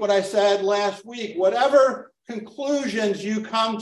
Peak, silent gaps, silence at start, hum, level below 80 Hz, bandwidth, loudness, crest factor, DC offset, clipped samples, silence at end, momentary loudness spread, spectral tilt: -6 dBFS; none; 0 s; none; -72 dBFS; 12 kHz; -22 LUFS; 16 dB; under 0.1%; under 0.1%; 0 s; 16 LU; -4 dB/octave